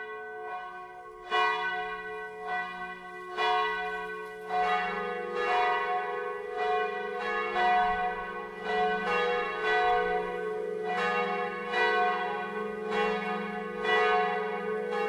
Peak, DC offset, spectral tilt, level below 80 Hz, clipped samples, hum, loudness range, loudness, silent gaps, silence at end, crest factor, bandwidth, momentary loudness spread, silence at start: -14 dBFS; under 0.1%; -4.5 dB/octave; -60 dBFS; under 0.1%; none; 3 LU; -30 LUFS; none; 0 s; 16 dB; 12 kHz; 13 LU; 0 s